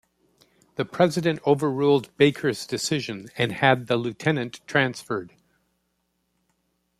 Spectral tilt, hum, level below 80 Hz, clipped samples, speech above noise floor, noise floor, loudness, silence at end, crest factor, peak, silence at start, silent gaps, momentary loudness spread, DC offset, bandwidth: -5 dB/octave; none; -64 dBFS; under 0.1%; 50 dB; -74 dBFS; -24 LUFS; 1.7 s; 22 dB; -2 dBFS; 0.8 s; none; 11 LU; under 0.1%; 14.5 kHz